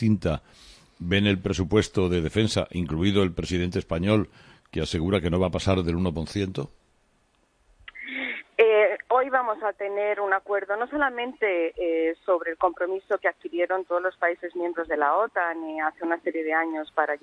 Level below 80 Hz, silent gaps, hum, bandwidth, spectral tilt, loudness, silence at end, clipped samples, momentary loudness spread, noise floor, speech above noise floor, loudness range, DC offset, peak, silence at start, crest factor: -46 dBFS; none; none; 10.5 kHz; -6 dB/octave; -25 LUFS; 0.05 s; under 0.1%; 8 LU; -66 dBFS; 41 dB; 3 LU; under 0.1%; -6 dBFS; 0 s; 20 dB